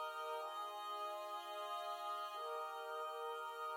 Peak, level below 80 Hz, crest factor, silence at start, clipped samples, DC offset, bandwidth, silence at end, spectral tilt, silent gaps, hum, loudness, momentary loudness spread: -34 dBFS; under -90 dBFS; 12 dB; 0 s; under 0.1%; under 0.1%; 16.5 kHz; 0 s; 2 dB/octave; none; none; -46 LUFS; 2 LU